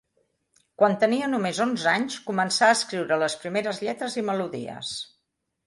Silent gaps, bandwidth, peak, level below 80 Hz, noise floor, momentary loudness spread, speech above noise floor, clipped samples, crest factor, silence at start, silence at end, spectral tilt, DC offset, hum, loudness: none; 11.5 kHz; -6 dBFS; -72 dBFS; -78 dBFS; 12 LU; 53 dB; under 0.1%; 20 dB; 0.8 s; 0.6 s; -3.5 dB/octave; under 0.1%; none; -25 LUFS